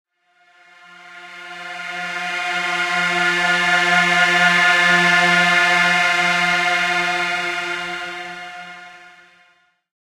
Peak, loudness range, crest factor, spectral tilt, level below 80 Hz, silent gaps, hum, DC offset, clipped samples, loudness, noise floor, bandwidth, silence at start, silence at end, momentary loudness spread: -2 dBFS; 9 LU; 16 dB; -2.5 dB/octave; -66 dBFS; none; none; under 0.1%; under 0.1%; -16 LUFS; -58 dBFS; 16 kHz; 1 s; 1.05 s; 19 LU